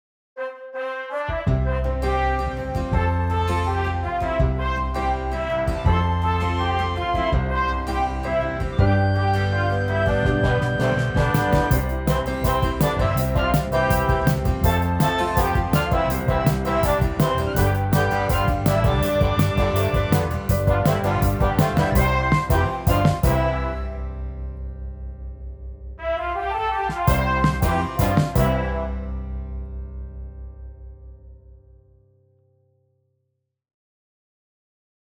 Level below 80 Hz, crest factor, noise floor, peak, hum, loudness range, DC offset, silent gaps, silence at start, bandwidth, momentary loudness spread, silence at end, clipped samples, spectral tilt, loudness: -30 dBFS; 18 dB; -75 dBFS; -4 dBFS; none; 6 LU; under 0.1%; none; 0.35 s; over 20 kHz; 13 LU; 3.75 s; under 0.1%; -6.5 dB/octave; -21 LUFS